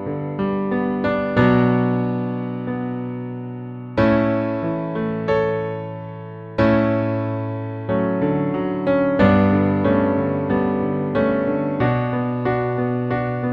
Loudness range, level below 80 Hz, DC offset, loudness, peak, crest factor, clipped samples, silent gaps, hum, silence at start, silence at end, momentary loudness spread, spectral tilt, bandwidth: 4 LU; -44 dBFS; under 0.1%; -20 LUFS; -2 dBFS; 16 dB; under 0.1%; none; none; 0 s; 0 s; 11 LU; -10 dB/octave; 5.8 kHz